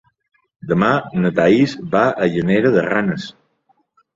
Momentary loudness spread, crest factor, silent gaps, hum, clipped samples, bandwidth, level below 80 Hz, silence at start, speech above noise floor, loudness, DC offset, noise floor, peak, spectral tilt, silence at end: 9 LU; 16 dB; none; none; under 0.1%; 7.6 kHz; -54 dBFS; 0.65 s; 46 dB; -17 LUFS; under 0.1%; -62 dBFS; -2 dBFS; -7.5 dB/octave; 0.85 s